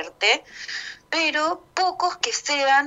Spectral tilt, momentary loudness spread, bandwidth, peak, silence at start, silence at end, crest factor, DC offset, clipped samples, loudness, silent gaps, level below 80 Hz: 0.5 dB/octave; 11 LU; 9 kHz; -4 dBFS; 0 s; 0 s; 20 dB; under 0.1%; under 0.1%; -23 LUFS; none; -66 dBFS